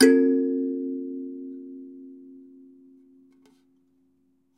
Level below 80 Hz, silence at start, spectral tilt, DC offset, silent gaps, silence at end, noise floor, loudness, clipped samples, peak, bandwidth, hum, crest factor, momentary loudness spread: -82 dBFS; 0 s; -3.5 dB/octave; under 0.1%; none; 2.2 s; -67 dBFS; -25 LUFS; under 0.1%; -4 dBFS; 13 kHz; none; 22 dB; 26 LU